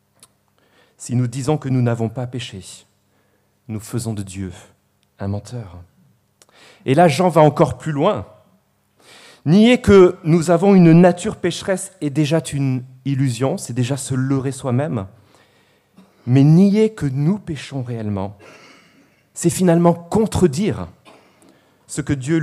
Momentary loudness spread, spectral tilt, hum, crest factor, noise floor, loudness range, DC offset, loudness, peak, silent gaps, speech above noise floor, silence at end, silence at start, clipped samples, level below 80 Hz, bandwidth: 19 LU; -7 dB/octave; 50 Hz at -45 dBFS; 18 dB; -61 dBFS; 15 LU; under 0.1%; -17 LUFS; 0 dBFS; none; 45 dB; 0 s; 1 s; under 0.1%; -48 dBFS; 13.5 kHz